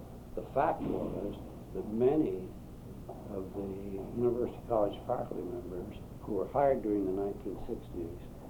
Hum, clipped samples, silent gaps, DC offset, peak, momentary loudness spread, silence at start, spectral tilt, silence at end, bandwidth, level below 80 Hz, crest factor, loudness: none; under 0.1%; none; under 0.1%; -16 dBFS; 16 LU; 0 s; -8.5 dB/octave; 0 s; over 20 kHz; -52 dBFS; 18 dB; -35 LUFS